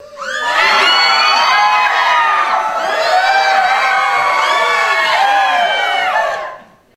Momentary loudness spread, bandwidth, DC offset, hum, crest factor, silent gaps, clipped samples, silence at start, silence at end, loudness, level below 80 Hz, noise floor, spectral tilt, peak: 7 LU; 15.5 kHz; under 0.1%; none; 12 dB; none; under 0.1%; 0 s; 0.35 s; -11 LUFS; -56 dBFS; -33 dBFS; 0.5 dB/octave; 0 dBFS